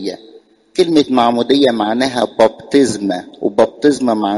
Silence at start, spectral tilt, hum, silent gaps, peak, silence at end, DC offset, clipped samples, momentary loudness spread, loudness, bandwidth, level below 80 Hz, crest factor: 0 s; -4.5 dB/octave; none; none; 0 dBFS; 0 s; under 0.1%; under 0.1%; 8 LU; -14 LUFS; 11.5 kHz; -54 dBFS; 14 dB